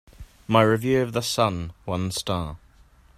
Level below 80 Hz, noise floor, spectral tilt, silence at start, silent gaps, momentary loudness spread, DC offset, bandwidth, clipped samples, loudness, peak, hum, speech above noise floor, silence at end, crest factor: -48 dBFS; -54 dBFS; -5 dB/octave; 0.2 s; none; 13 LU; under 0.1%; 15.5 kHz; under 0.1%; -24 LUFS; -4 dBFS; none; 31 dB; 0.6 s; 22 dB